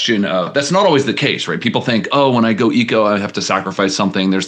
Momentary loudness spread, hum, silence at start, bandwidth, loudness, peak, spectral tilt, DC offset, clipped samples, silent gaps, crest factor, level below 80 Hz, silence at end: 5 LU; none; 0 s; 9.8 kHz; -15 LUFS; 0 dBFS; -4.5 dB/octave; under 0.1%; under 0.1%; none; 14 dB; -64 dBFS; 0 s